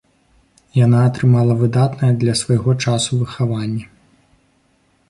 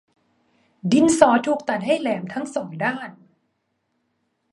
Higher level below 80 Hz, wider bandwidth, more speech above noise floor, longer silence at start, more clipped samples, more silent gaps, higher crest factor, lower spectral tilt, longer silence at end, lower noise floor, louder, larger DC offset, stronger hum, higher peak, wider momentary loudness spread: first, -48 dBFS vs -62 dBFS; about the same, 11.5 kHz vs 11.5 kHz; second, 44 dB vs 53 dB; about the same, 0.75 s vs 0.85 s; neither; neither; second, 14 dB vs 22 dB; first, -6.5 dB/octave vs -5 dB/octave; second, 1.25 s vs 1.4 s; second, -59 dBFS vs -73 dBFS; first, -16 LUFS vs -20 LUFS; neither; neither; second, -4 dBFS vs 0 dBFS; second, 8 LU vs 15 LU